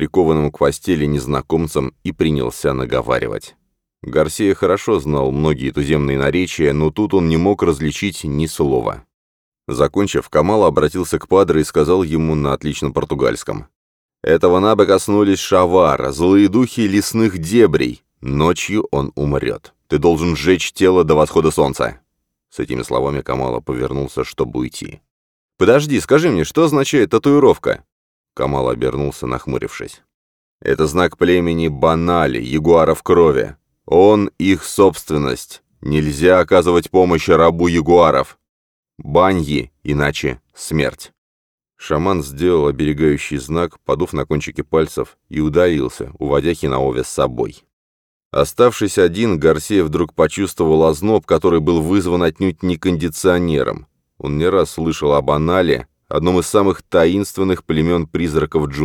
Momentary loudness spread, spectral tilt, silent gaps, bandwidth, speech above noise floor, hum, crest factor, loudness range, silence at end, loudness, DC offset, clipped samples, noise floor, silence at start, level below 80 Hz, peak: 10 LU; -6 dB/octave; 9.14-9.52 s, 13.76-14.09 s, 25.11-25.49 s, 27.92-28.24 s, 30.14-30.59 s, 38.49-38.83 s, 41.18-41.58 s, 47.73-48.31 s; 18 kHz; 56 dB; none; 16 dB; 5 LU; 0 s; -16 LUFS; 0.1%; under 0.1%; -72 dBFS; 0 s; -36 dBFS; 0 dBFS